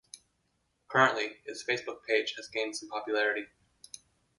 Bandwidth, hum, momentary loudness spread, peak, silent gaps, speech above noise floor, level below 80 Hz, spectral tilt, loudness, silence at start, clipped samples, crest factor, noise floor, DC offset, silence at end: 11.5 kHz; none; 24 LU; -12 dBFS; none; 45 dB; -78 dBFS; -3 dB/octave; -31 LUFS; 0.15 s; under 0.1%; 22 dB; -76 dBFS; under 0.1%; 0.95 s